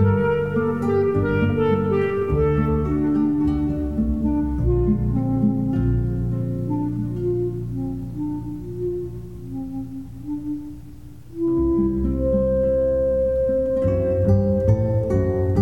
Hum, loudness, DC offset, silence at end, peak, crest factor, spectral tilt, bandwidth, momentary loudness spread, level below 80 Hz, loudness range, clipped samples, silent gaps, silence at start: none; -22 LUFS; 0.7%; 0 s; -6 dBFS; 16 dB; -10.5 dB/octave; 7.2 kHz; 11 LU; -32 dBFS; 9 LU; under 0.1%; none; 0 s